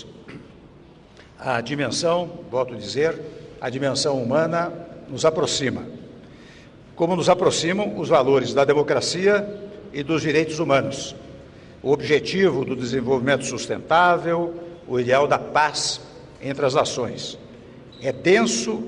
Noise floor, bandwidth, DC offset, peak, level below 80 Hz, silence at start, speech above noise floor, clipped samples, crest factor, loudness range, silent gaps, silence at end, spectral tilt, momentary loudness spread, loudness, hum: -48 dBFS; 11 kHz; under 0.1%; -6 dBFS; -54 dBFS; 0 s; 26 dB; under 0.1%; 16 dB; 4 LU; none; 0 s; -4.5 dB/octave; 16 LU; -21 LUFS; none